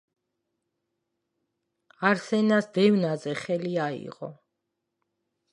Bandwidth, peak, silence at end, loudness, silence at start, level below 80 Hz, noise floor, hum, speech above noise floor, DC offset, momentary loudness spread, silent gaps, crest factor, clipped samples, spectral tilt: 10.5 kHz; -6 dBFS; 1.2 s; -25 LUFS; 2 s; -76 dBFS; -82 dBFS; none; 57 dB; under 0.1%; 16 LU; none; 22 dB; under 0.1%; -6.5 dB/octave